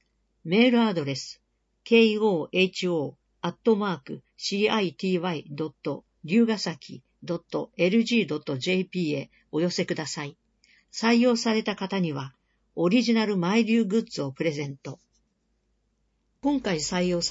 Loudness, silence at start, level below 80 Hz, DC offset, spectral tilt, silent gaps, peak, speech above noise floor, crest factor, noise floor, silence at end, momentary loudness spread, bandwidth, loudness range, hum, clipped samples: -26 LUFS; 0.45 s; -64 dBFS; under 0.1%; -5 dB/octave; none; -6 dBFS; 47 dB; 20 dB; -72 dBFS; 0 s; 14 LU; 8 kHz; 4 LU; none; under 0.1%